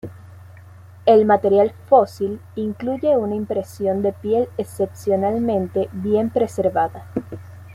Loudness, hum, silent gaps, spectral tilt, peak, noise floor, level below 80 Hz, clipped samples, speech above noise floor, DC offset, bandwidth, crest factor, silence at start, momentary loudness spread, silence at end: -20 LUFS; none; none; -7.5 dB/octave; -2 dBFS; -42 dBFS; -58 dBFS; under 0.1%; 23 dB; under 0.1%; 15 kHz; 18 dB; 0.05 s; 12 LU; 0 s